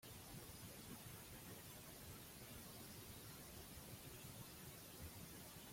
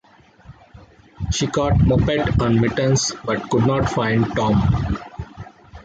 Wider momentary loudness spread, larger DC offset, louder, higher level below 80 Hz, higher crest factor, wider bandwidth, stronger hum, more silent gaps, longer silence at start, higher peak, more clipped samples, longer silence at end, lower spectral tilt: second, 1 LU vs 17 LU; neither; second, -56 LUFS vs -19 LUFS; second, -70 dBFS vs -32 dBFS; about the same, 14 dB vs 14 dB; first, 16.5 kHz vs 9.2 kHz; neither; neither; second, 0 s vs 0.5 s; second, -42 dBFS vs -6 dBFS; neither; about the same, 0 s vs 0.05 s; second, -3.5 dB/octave vs -5.5 dB/octave